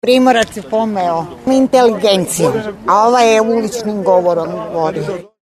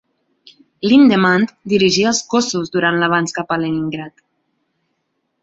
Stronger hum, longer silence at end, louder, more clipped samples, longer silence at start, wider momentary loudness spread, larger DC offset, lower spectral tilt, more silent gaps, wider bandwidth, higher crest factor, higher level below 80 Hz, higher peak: neither; second, 0.2 s vs 1.35 s; about the same, -13 LUFS vs -15 LUFS; neither; second, 0.05 s vs 0.85 s; second, 9 LU vs 12 LU; neither; about the same, -4.5 dB/octave vs -4.5 dB/octave; neither; first, 13.5 kHz vs 8 kHz; about the same, 12 dB vs 16 dB; first, -50 dBFS vs -56 dBFS; about the same, 0 dBFS vs -2 dBFS